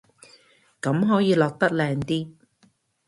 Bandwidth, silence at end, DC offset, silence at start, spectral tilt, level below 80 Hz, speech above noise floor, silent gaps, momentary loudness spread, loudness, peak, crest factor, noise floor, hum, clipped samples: 11.5 kHz; 0.75 s; under 0.1%; 0.85 s; -7 dB/octave; -60 dBFS; 41 dB; none; 10 LU; -23 LUFS; -6 dBFS; 20 dB; -63 dBFS; none; under 0.1%